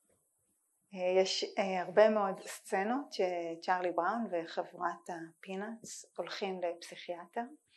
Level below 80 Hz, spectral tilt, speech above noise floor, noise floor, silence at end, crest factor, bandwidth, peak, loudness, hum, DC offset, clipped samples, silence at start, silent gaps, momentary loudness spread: under -90 dBFS; -4 dB/octave; 43 dB; -78 dBFS; 0.2 s; 22 dB; 12 kHz; -12 dBFS; -35 LUFS; none; under 0.1%; under 0.1%; 0.9 s; none; 15 LU